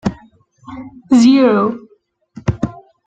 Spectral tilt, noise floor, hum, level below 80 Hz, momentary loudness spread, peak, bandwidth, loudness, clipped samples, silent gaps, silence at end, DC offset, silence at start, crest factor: -6.5 dB/octave; -55 dBFS; none; -42 dBFS; 23 LU; -2 dBFS; 8.8 kHz; -14 LUFS; under 0.1%; none; 0.35 s; under 0.1%; 0.05 s; 14 dB